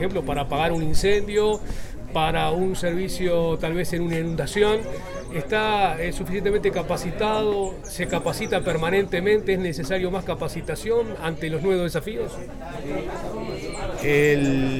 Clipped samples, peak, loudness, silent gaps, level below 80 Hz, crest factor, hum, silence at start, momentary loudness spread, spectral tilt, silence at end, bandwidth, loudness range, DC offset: under 0.1%; -6 dBFS; -24 LUFS; none; -36 dBFS; 16 dB; none; 0 s; 10 LU; -5.5 dB/octave; 0 s; 16.5 kHz; 3 LU; under 0.1%